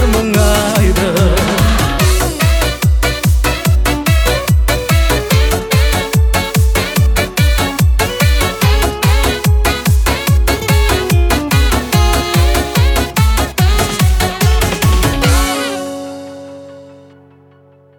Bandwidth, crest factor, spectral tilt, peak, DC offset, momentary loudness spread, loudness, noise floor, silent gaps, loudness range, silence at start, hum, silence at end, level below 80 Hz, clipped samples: 19.5 kHz; 12 dB; -4.5 dB/octave; 0 dBFS; under 0.1%; 1 LU; -13 LUFS; -45 dBFS; none; 1 LU; 0 s; none; 1.05 s; -16 dBFS; under 0.1%